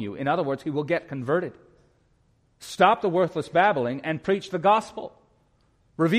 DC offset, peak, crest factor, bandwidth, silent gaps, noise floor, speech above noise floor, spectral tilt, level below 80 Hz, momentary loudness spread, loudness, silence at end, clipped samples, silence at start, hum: under 0.1%; -4 dBFS; 20 dB; 15 kHz; none; -64 dBFS; 40 dB; -6 dB/octave; -64 dBFS; 18 LU; -24 LUFS; 0 s; under 0.1%; 0 s; none